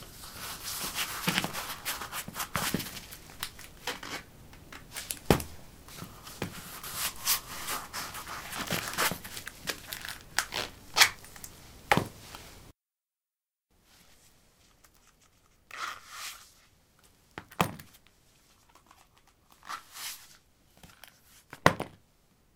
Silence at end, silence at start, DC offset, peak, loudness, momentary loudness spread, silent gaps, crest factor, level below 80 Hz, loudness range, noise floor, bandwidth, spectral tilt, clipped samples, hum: 0.6 s; 0 s; under 0.1%; -2 dBFS; -32 LUFS; 21 LU; none; 36 dB; -56 dBFS; 15 LU; under -90 dBFS; 18 kHz; -2.5 dB/octave; under 0.1%; none